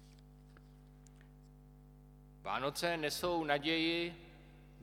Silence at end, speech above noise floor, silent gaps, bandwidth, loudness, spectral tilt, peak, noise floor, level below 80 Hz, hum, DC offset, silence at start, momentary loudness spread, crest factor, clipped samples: 0 s; 22 dB; none; 19 kHz; -36 LUFS; -4 dB/octave; -18 dBFS; -58 dBFS; -62 dBFS; 50 Hz at -60 dBFS; under 0.1%; 0 s; 21 LU; 22 dB; under 0.1%